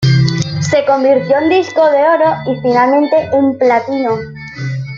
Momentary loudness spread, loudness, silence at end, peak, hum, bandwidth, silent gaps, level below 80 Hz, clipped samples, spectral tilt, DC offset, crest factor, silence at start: 9 LU; -12 LUFS; 0 s; -2 dBFS; none; 7.6 kHz; none; -46 dBFS; under 0.1%; -6.5 dB/octave; under 0.1%; 10 dB; 0 s